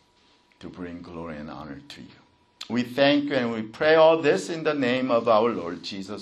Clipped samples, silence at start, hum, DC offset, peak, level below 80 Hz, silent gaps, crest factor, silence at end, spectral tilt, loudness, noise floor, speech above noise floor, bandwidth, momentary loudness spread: under 0.1%; 0.6 s; none; under 0.1%; -6 dBFS; -62 dBFS; none; 20 dB; 0 s; -5.5 dB/octave; -23 LUFS; -61 dBFS; 37 dB; 12.5 kHz; 22 LU